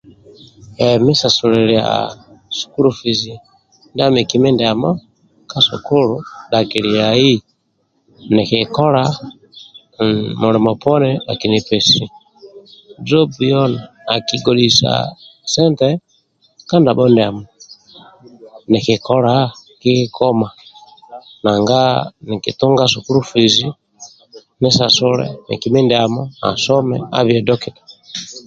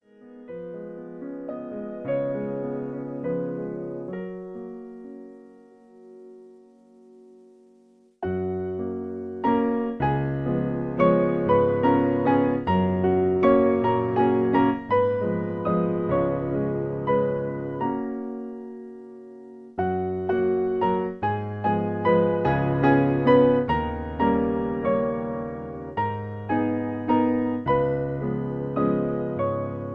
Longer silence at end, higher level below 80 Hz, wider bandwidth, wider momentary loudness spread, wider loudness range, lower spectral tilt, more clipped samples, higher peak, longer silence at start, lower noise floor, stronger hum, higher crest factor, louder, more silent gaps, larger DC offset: about the same, 0.05 s vs 0 s; about the same, -50 dBFS vs -50 dBFS; first, 9 kHz vs 5.4 kHz; second, 12 LU vs 16 LU; second, 2 LU vs 13 LU; second, -5 dB/octave vs -10.5 dB/octave; neither; first, 0 dBFS vs -6 dBFS; first, 0.6 s vs 0.25 s; first, -64 dBFS vs -57 dBFS; neither; about the same, 16 dB vs 18 dB; first, -14 LUFS vs -24 LUFS; neither; neither